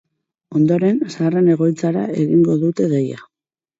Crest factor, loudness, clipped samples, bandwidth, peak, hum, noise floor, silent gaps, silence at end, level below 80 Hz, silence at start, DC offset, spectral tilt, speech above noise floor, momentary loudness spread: 12 dB; -17 LUFS; under 0.1%; 7.8 kHz; -4 dBFS; none; under -90 dBFS; none; 0.6 s; -62 dBFS; 0.5 s; under 0.1%; -8.5 dB/octave; over 74 dB; 7 LU